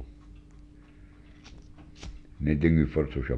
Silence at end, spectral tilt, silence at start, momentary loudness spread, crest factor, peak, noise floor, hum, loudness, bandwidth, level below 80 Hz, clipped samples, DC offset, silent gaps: 0 s; -9 dB/octave; 0 s; 27 LU; 22 dB; -8 dBFS; -51 dBFS; none; -26 LUFS; 7 kHz; -40 dBFS; under 0.1%; under 0.1%; none